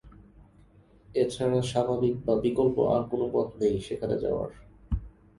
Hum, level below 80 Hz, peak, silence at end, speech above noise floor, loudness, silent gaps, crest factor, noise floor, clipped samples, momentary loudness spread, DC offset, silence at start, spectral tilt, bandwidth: 50 Hz at -50 dBFS; -46 dBFS; -10 dBFS; 0.3 s; 30 dB; -28 LUFS; none; 18 dB; -57 dBFS; under 0.1%; 11 LU; under 0.1%; 0.05 s; -7 dB/octave; 11.5 kHz